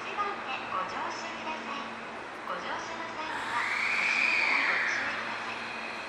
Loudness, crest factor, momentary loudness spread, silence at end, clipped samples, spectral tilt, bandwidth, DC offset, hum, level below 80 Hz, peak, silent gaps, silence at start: -30 LUFS; 16 dB; 12 LU; 0 s; under 0.1%; -2 dB/octave; 14.5 kHz; under 0.1%; none; -68 dBFS; -16 dBFS; none; 0 s